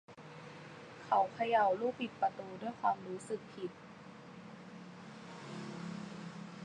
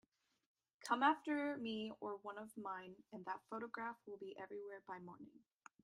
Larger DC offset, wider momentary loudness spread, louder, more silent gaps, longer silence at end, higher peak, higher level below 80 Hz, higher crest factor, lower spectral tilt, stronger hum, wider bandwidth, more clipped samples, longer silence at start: neither; about the same, 20 LU vs 18 LU; first, -37 LUFS vs -45 LUFS; neither; second, 0 s vs 0.45 s; first, -18 dBFS vs -22 dBFS; first, -80 dBFS vs -90 dBFS; about the same, 20 dB vs 24 dB; about the same, -5.5 dB/octave vs -4.5 dB/octave; neither; second, 10 kHz vs 13 kHz; neither; second, 0.1 s vs 0.8 s